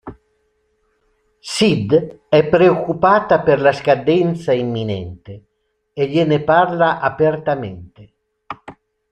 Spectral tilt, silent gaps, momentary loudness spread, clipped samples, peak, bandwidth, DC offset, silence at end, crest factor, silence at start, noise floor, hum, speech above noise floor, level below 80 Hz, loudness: -6 dB/octave; none; 21 LU; under 0.1%; 0 dBFS; 11.5 kHz; under 0.1%; 0.4 s; 16 dB; 0.05 s; -65 dBFS; none; 49 dB; -52 dBFS; -16 LUFS